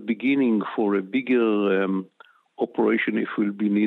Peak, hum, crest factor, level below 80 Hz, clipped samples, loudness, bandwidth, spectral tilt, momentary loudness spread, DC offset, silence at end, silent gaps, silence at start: -10 dBFS; none; 12 dB; -76 dBFS; under 0.1%; -23 LUFS; 4.2 kHz; -9 dB/octave; 6 LU; under 0.1%; 0 s; none; 0 s